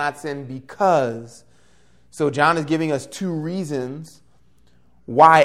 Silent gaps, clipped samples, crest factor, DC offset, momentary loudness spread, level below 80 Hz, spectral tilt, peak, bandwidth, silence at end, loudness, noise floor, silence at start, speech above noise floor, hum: none; under 0.1%; 20 dB; 0.2%; 16 LU; -62 dBFS; -5.5 dB/octave; 0 dBFS; 14.5 kHz; 0 s; -21 LUFS; -59 dBFS; 0 s; 40 dB; none